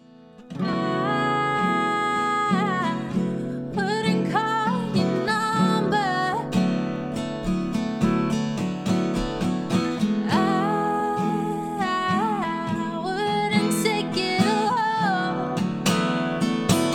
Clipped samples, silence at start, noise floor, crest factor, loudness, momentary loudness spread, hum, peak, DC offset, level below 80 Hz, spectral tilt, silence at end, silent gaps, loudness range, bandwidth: under 0.1%; 0.2 s; -47 dBFS; 18 dB; -24 LUFS; 6 LU; none; -6 dBFS; under 0.1%; -50 dBFS; -5.5 dB/octave; 0 s; none; 2 LU; 17.5 kHz